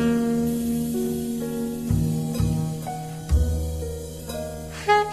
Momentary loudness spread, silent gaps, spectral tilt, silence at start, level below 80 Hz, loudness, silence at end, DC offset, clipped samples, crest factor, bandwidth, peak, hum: 10 LU; none; -6.5 dB/octave; 0 s; -32 dBFS; -26 LUFS; 0 s; under 0.1%; under 0.1%; 20 dB; 14.5 kHz; -4 dBFS; none